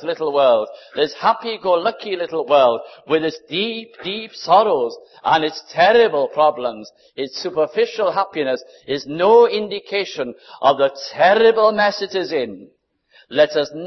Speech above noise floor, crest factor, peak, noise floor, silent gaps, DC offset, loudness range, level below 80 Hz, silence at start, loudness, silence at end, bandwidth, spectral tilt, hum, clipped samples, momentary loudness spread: 36 dB; 16 dB; -2 dBFS; -54 dBFS; none; under 0.1%; 3 LU; -62 dBFS; 0 s; -18 LUFS; 0 s; 6.2 kHz; -4.5 dB/octave; none; under 0.1%; 14 LU